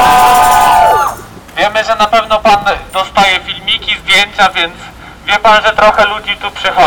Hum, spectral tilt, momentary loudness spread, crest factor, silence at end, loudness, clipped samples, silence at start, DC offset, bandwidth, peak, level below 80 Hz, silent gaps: none; -2 dB/octave; 10 LU; 10 dB; 0 s; -9 LUFS; under 0.1%; 0 s; under 0.1%; over 20 kHz; 0 dBFS; -34 dBFS; none